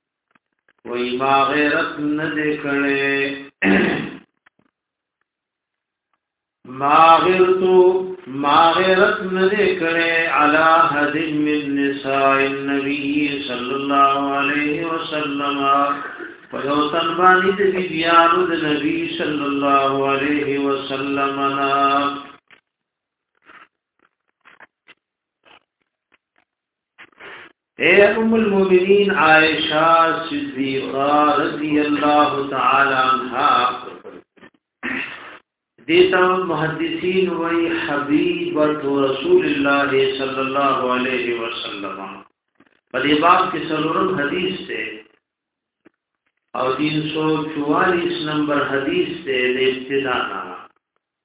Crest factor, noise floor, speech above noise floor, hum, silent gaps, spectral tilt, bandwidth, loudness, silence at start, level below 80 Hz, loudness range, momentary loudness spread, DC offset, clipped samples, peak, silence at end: 18 dB; -83 dBFS; 65 dB; none; none; -9 dB/octave; 4 kHz; -17 LUFS; 0.85 s; -56 dBFS; 7 LU; 12 LU; under 0.1%; under 0.1%; 0 dBFS; 0.6 s